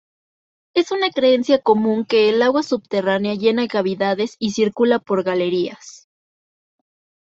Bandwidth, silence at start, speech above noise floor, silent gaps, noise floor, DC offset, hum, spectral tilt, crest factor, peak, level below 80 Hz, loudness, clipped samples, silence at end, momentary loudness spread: 7.8 kHz; 0.75 s; over 72 dB; none; under -90 dBFS; under 0.1%; none; -5 dB/octave; 16 dB; -2 dBFS; -64 dBFS; -18 LUFS; under 0.1%; 1.4 s; 6 LU